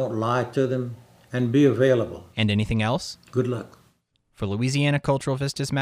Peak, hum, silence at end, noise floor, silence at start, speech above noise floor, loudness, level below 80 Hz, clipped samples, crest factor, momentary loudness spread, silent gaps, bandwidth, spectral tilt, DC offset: -6 dBFS; none; 0 s; -66 dBFS; 0 s; 43 dB; -24 LUFS; -50 dBFS; under 0.1%; 16 dB; 13 LU; none; 14.5 kHz; -6.5 dB/octave; under 0.1%